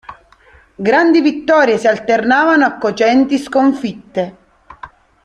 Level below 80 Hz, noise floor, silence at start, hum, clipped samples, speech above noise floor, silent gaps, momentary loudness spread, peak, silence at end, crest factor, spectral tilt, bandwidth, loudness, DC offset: -54 dBFS; -47 dBFS; 0.1 s; none; under 0.1%; 34 dB; none; 11 LU; 0 dBFS; 0.35 s; 14 dB; -5 dB/octave; 10.5 kHz; -13 LUFS; under 0.1%